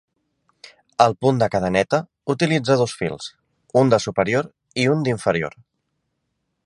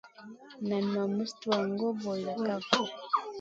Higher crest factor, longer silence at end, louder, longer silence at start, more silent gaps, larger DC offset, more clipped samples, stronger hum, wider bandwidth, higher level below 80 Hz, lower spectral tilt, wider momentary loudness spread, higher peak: about the same, 22 dB vs 24 dB; first, 1.15 s vs 0 s; first, -20 LUFS vs -32 LUFS; first, 1 s vs 0.05 s; neither; neither; neither; neither; first, 11.5 kHz vs 7.8 kHz; first, -54 dBFS vs -76 dBFS; about the same, -6 dB/octave vs -5 dB/octave; about the same, 11 LU vs 10 LU; first, 0 dBFS vs -10 dBFS